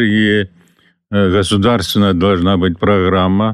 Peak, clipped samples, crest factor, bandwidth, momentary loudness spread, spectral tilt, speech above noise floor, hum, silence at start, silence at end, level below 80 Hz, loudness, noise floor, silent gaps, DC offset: -4 dBFS; under 0.1%; 10 dB; 13 kHz; 4 LU; -6 dB/octave; 41 dB; none; 0 s; 0 s; -40 dBFS; -13 LUFS; -53 dBFS; none; 0.3%